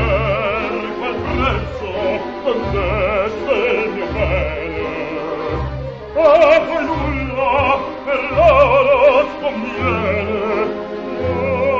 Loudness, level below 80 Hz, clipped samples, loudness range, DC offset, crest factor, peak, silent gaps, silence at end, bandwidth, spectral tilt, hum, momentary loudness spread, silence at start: -17 LUFS; -30 dBFS; under 0.1%; 5 LU; under 0.1%; 16 dB; -2 dBFS; none; 0 s; 7.2 kHz; -7 dB/octave; none; 11 LU; 0 s